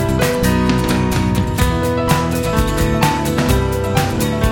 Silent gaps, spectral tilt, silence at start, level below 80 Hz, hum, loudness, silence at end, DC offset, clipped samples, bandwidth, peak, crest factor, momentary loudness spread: none; -5.5 dB/octave; 0 s; -24 dBFS; none; -16 LUFS; 0 s; under 0.1%; under 0.1%; 19 kHz; 0 dBFS; 14 dB; 2 LU